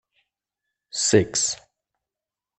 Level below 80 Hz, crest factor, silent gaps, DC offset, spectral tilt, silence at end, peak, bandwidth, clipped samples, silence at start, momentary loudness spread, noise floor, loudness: -60 dBFS; 24 dB; none; under 0.1%; -3 dB/octave; 1 s; -4 dBFS; 8.8 kHz; under 0.1%; 0.95 s; 14 LU; -89 dBFS; -21 LUFS